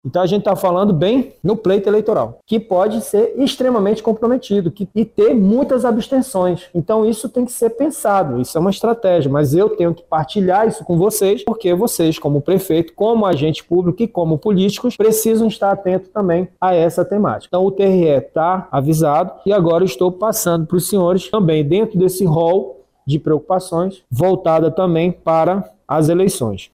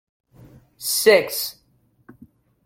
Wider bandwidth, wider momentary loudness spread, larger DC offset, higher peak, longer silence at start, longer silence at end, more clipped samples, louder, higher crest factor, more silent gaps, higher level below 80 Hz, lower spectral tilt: about the same, 16 kHz vs 16.5 kHz; second, 5 LU vs 15 LU; neither; about the same, -2 dBFS vs -2 dBFS; second, 0.05 s vs 0.8 s; second, 0.1 s vs 1.15 s; neither; first, -16 LUFS vs -19 LUFS; second, 14 dB vs 22 dB; neither; first, -48 dBFS vs -64 dBFS; first, -6.5 dB/octave vs -1.5 dB/octave